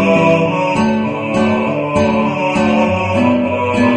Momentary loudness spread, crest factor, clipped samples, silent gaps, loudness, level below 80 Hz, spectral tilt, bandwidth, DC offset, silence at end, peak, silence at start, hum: 4 LU; 14 dB; under 0.1%; none; -14 LUFS; -44 dBFS; -6.5 dB/octave; 9.8 kHz; under 0.1%; 0 s; 0 dBFS; 0 s; none